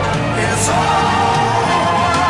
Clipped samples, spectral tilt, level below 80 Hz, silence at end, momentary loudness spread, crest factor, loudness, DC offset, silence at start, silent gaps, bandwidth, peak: under 0.1%; -4 dB/octave; -36 dBFS; 0 s; 3 LU; 12 dB; -15 LUFS; under 0.1%; 0 s; none; 12 kHz; -4 dBFS